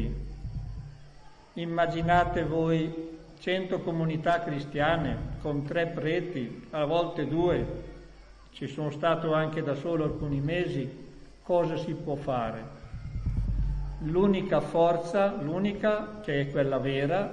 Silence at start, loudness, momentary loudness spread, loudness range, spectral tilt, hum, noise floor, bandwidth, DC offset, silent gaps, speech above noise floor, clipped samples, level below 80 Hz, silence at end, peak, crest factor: 0 s; -29 LUFS; 14 LU; 4 LU; -7.5 dB/octave; none; -50 dBFS; 10 kHz; under 0.1%; none; 22 dB; under 0.1%; -42 dBFS; 0 s; -8 dBFS; 20 dB